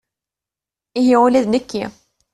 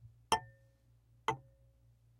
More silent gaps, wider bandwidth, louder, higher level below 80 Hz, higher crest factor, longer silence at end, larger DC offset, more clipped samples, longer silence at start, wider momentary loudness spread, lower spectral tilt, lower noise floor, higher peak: neither; second, 11.5 kHz vs 16 kHz; first, -16 LUFS vs -39 LUFS; first, -56 dBFS vs -68 dBFS; second, 16 dB vs 28 dB; second, 0.45 s vs 0.8 s; neither; neither; first, 0.95 s vs 0.05 s; first, 15 LU vs 12 LU; first, -5.5 dB/octave vs -2.5 dB/octave; first, -88 dBFS vs -68 dBFS; first, -2 dBFS vs -14 dBFS